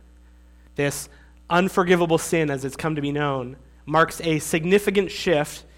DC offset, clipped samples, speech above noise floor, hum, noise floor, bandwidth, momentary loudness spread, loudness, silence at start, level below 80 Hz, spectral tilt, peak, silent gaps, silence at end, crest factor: under 0.1%; under 0.1%; 28 dB; none; -50 dBFS; 16.5 kHz; 11 LU; -22 LUFS; 0.8 s; -50 dBFS; -5 dB/octave; -6 dBFS; none; 0.15 s; 18 dB